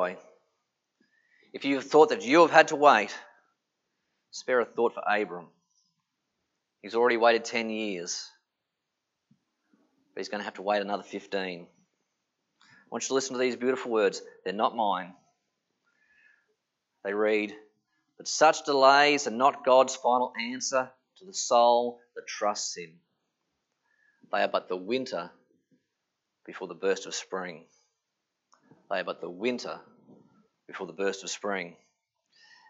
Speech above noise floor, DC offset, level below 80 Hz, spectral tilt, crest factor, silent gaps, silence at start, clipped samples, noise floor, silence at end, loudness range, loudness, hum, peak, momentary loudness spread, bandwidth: 58 dB; under 0.1%; under -90 dBFS; -2.5 dB/octave; 26 dB; none; 0 s; under 0.1%; -84 dBFS; 1 s; 12 LU; -27 LUFS; none; -2 dBFS; 20 LU; 8.2 kHz